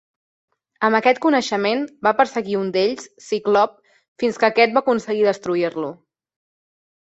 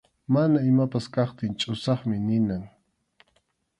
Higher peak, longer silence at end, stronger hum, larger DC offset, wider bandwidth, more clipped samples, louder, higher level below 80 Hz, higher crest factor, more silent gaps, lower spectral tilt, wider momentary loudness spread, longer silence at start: first, -2 dBFS vs -10 dBFS; first, 1.25 s vs 1.1 s; neither; neither; second, 8.2 kHz vs 11 kHz; neither; first, -19 LUFS vs -25 LUFS; second, -66 dBFS vs -58 dBFS; about the same, 20 dB vs 16 dB; first, 4.08-4.16 s vs none; second, -4.5 dB/octave vs -7.5 dB/octave; about the same, 8 LU vs 7 LU; first, 0.8 s vs 0.3 s